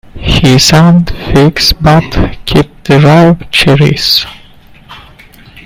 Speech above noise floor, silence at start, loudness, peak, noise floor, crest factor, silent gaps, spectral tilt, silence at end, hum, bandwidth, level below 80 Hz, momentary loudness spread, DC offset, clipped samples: 30 dB; 0.15 s; -7 LUFS; 0 dBFS; -36 dBFS; 8 dB; none; -5 dB/octave; 0.65 s; none; 16.5 kHz; -22 dBFS; 7 LU; under 0.1%; 1%